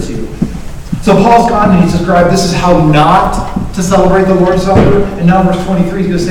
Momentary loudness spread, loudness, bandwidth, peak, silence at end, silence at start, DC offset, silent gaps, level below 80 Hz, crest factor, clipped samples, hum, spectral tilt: 11 LU; -9 LUFS; 14.5 kHz; 0 dBFS; 0 s; 0 s; under 0.1%; none; -22 dBFS; 8 dB; 3%; none; -6.5 dB/octave